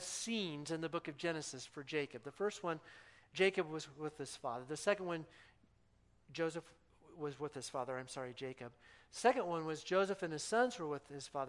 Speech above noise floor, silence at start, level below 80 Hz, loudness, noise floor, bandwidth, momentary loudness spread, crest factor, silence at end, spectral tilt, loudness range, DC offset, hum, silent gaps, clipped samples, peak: 31 dB; 0 s; -78 dBFS; -40 LUFS; -71 dBFS; 12 kHz; 13 LU; 24 dB; 0 s; -4 dB/octave; 7 LU; under 0.1%; none; none; under 0.1%; -18 dBFS